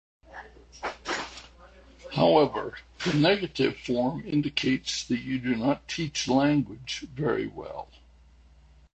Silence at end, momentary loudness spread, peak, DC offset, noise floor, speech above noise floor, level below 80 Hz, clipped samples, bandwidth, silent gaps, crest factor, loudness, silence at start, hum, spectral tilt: 1.1 s; 17 LU; -8 dBFS; under 0.1%; -56 dBFS; 29 dB; -54 dBFS; under 0.1%; 8.8 kHz; none; 22 dB; -27 LUFS; 0.3 s; none; -5 dB/octave